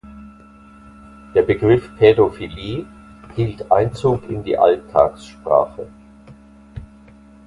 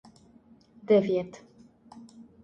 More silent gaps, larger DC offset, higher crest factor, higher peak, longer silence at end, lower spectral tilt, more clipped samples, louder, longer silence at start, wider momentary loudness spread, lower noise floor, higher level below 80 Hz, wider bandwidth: neither; neither; about the same, 18 dB vs 20 dB; first, 0 dBFS vs -12 dBFS; first, 0.6 s vs 0.2 s; about the same, -8 dB/octave vs -7.5 dB/octave; neither; first, -18 LUFS vs -25 LUFS; second, 0.05 s vs 0.9 s; second, 23 LU vs 27 LU; second, -45 dBFS vs -58 dBFS; first, -44 dBFS vs -70 dBFS; first, 11 kHz vs 8.2 kHz